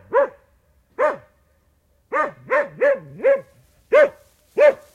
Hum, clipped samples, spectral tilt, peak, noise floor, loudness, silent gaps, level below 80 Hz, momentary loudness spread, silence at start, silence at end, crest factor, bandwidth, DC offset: none; under 0.1%; -5 dB/octave; -4 dBFS; -62 dBFS; -20 LUFS; none; -62 dBFS; 10 LU; 0.1 s; 0.2 s; 18 dB; 9 kHz; under 0.1%